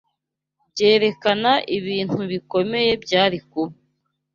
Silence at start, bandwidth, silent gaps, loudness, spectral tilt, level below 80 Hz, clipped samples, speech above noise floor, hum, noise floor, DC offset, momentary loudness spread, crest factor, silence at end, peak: 0.75 s; 7.4 kHz; none; -20 LUFS; -5 dB/octave; -60 dBFS; under 0.1%; 61 dB; none; -81 dBFS; under 0.1%; 11 LU; 18 dB; 0.6 s; -2 dBFS